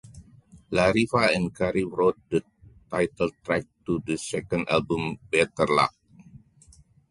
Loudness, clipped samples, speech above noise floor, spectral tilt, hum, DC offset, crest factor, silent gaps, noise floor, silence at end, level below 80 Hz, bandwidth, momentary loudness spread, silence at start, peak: -25 LUFS; under 0.1%; 31 dB; -5.5 dB/octave; none; under 0.1%; 20 dB; none; -56 dBFS; 0.75 s; -52 dBFS; 11.5 kHz; 8 LU; 0.05 s; -6 dBFS